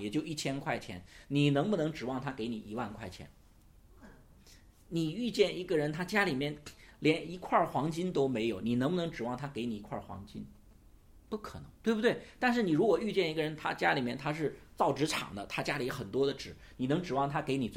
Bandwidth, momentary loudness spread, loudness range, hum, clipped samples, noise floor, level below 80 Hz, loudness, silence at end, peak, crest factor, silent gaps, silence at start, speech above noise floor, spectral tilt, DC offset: 16.5 kHz; 14 LU; 6 LU; none; under 0.1%; -60 dBFS; -60 dBFS; -33 LUFS; 0 s; -14 dBFS; 20 dB; none; 0 s; 27 dB; -5.5 dB/octave; under 0.1%